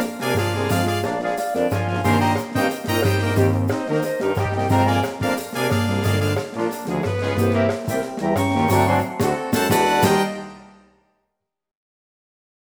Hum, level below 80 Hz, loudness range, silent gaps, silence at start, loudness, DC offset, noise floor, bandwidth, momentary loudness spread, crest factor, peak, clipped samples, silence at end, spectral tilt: none; -50 dBFS; 2 LU; none; 0 s; -21 LUFS; under 0.1%; -77 dBFS; over 20 kHz; 6 LU; 16 dB; -4 dBFS; under 0.1%; 2 s; -5.5 dB/octave